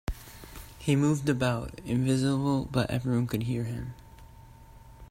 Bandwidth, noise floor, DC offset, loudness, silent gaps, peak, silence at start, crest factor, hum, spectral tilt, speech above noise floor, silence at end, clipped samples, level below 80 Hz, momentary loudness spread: 16 kHz; -50 dBFS; under 0.1%; -29 LUFS; none; -12 dBFS; 0.1 s; 16 dB; none; -6.5 dB/octave; 23 dB; 0.05 s; under 0.1%; -48 dBFS; 18 LU